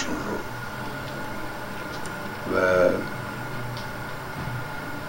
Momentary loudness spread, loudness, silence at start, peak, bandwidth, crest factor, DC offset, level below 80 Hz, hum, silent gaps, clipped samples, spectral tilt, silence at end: 12 LU; -28 LUFS; 0 s; -6 dBFS; 16 kHz; 22 dB; under 0.1%; -48 dBFS; none; none; under 0.1%; -5.5 dB/octave; 0 s